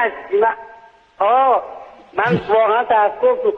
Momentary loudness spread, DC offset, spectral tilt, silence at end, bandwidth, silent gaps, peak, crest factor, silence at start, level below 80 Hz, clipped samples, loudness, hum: 13 LU; under 0.1%; -7.5 dB/octave; 0 s; 6 kHz; none; -2 dBFS; 14 dB; 0 s; -56 dBFS; under 0.1%; -16 LUFS; none